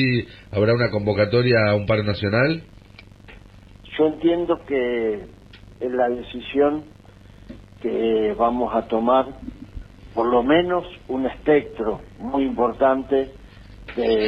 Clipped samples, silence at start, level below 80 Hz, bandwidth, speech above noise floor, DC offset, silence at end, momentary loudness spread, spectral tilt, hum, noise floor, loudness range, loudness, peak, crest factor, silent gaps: under 0.1%; 0 s; -46 dBFS; 6.2 kHz; 25 dB; under 0.1%; 0 s; 13 LU; -8.5 dB/octave; none; -46 dBFS; 4 LU; -21 LUFS; -6 dBFS; 16 dB; none